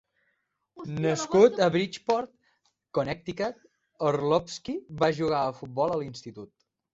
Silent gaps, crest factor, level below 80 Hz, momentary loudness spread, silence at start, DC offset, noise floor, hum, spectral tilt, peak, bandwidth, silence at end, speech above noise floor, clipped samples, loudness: none; 22 dB; -62 dBFS; 18 LU; 0.75 s; under 0.1%; -76 dBFS; none; -5.5 dB/octave; -6 dBFS; 8 kHz; 0.5 s; 50 dB; under 0.1%; -27 LUFS